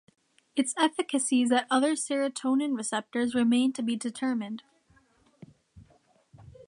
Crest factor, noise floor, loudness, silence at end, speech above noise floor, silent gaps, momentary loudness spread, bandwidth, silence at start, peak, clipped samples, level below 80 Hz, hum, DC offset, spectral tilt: 20 dB; -64 dBFS; -27 LUFS; 0.05 s; 37 dB; none; 7 LU; 11 kHz; 0.55 s; -8 dBFS; under 0.1%; -70 dBFS; none; under 0.1%; -3 dB/octave